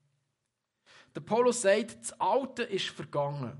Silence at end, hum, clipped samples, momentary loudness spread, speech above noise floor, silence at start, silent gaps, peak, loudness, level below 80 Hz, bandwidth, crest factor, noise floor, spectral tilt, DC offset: 0 s; none; under 0.1%; 11 LU; 54 dB; 1.15 s; none; -12 dBFS; -30 LUFS; -78 dBFS; 11.5 kHz; 20 dB; -84 dBFS; -4 dB/octave; under 0.1%